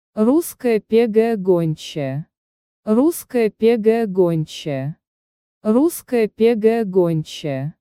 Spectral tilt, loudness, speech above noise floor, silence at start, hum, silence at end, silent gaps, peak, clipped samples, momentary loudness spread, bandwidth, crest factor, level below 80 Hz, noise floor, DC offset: -6.5 dB/octave; -18 LUFS; over 72 dB; 0.15 s; none; 0.1 s; 2.37-2.83 s, 5.07-5.61 s; -4 dBFS; under 0.1%; 10 LU; 16.5 kHz; 14 dB; -60 dBFS; under -90 dBFS; under 0.1%